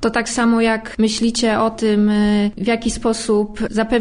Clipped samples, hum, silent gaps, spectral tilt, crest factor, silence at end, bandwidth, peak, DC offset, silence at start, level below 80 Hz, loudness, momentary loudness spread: under 0.1%; none; none; -4.5 dB/octave; 14 dB; 0 s; 10.5 kHz; -4 dBFS; under 0.1%; 0 s; -38 dBFS; -17 LUFS; 4 LU